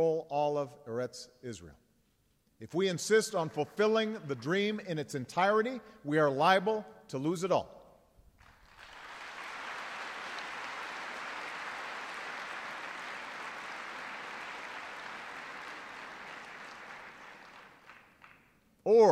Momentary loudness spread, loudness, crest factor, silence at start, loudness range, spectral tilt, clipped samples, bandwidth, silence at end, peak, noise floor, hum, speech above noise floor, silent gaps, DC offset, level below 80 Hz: 18 LU; -34 LUFS; 24 dB; 0 s; 13 LU; -4.5 dB/octave; under 0.1%; 15 kHz; 0 s; -12 dBFS; -72 dBFS; none; 41 dB; none; under 0.1%; -74 dBFS